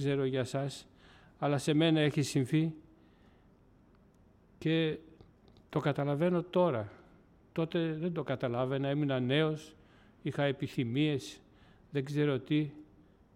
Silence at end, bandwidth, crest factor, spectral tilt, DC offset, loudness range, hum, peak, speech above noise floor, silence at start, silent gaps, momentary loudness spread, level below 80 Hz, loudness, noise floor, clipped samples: 0.5 s; 14 kHz; 16 dB; -6.5 dB/octave; under 0.1%; 3 LU; none; -18 dBFS; 32 dB; 0 s; none; 11 LU; -68 dBFS; -33 LUFS; -63 dBFS; under 0.1%